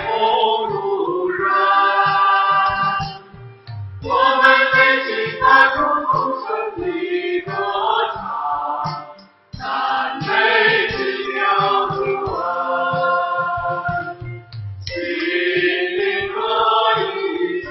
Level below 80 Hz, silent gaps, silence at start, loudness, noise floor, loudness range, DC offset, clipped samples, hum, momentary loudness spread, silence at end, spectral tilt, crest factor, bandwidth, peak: -48 dBFS; none; 0 s; -17 LUFS; -42 dBFS; 7 LU; under 0.1%; under 0.1%; none; 13 LU; 0 s; -6 dB/octave; 18 dB; 6.2 kHz; 0 dBFS